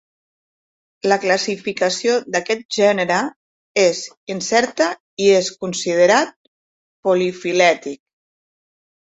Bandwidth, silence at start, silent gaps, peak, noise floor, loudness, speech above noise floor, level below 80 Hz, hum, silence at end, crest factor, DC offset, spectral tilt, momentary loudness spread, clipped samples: 8.2 kHz; 1.05 s; 2.65-2.69 s, 3.36-3.75 s, 4.17-4.27 s, 5.00-5.17 s, 6.36-7.03 s; -2 dBFS; under -90 dBFS; -18 LUFS; over 73 dB; -66 dBFS; none; 1.25 s; 18 dB; under 0.1%; -3.5 dB/octave; 10 LU; under 0.1%